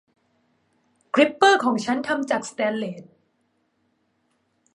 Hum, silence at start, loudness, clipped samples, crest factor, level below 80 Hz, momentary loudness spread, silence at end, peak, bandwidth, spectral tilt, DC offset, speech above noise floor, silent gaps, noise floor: none; 1.15 s; -21 LUFS; under 0.1%; 24 dB; -72 dBFS; 13 LU; 1.75 s; -2 dBFS; 11.5 kHz; -3.5 dB/octave; under 0.1%; 49 dB; none; -70 dBFS